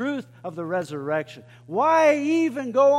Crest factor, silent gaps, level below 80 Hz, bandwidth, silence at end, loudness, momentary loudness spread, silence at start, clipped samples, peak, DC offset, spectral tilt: 14 dB; none; -74 dBFS; 12 kHz; 0 s; -23 LUFS; 15 LU; 0 s; under 0.1%; -8 dBFS; under 0.1%; -5.5 dB/octave